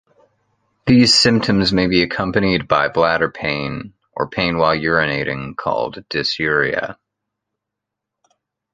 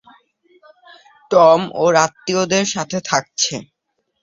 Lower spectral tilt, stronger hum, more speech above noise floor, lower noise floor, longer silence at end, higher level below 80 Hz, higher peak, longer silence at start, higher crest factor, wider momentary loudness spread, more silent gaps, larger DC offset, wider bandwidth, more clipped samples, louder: first, -4.5 dB/octave vs -3 dB/octave; neither; first, 65 dB vs 56 dB; first, -82 dBFS vs -72 dBFS; first, 1.8 s vs 0.6 s; first, -44 dBFS vs -60 dBFS; about the same, 0 dBFS vs 0 dBFS; second, 0.85 s vs 1.3 s; about the same, 18 dB vs 18 dB; first, 12 LU vs 9 LU; neither; neither; first, 9.6 kHz vs 7.8 kHz; neither; about the same, -17 LUFS vs -16 LUFS